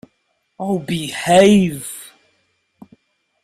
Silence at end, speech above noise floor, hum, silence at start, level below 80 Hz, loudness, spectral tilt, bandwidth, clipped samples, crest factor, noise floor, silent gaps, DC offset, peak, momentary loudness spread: 1.4 s; 53 dB; none; 0.6 s; -54 dBFS; -16 LUFS; -5 dB/octave; 15.5 kHz; under 0.1%; 18 dB; -67 dBFS; none; under 0.1%; 0 dBFS; 19 LU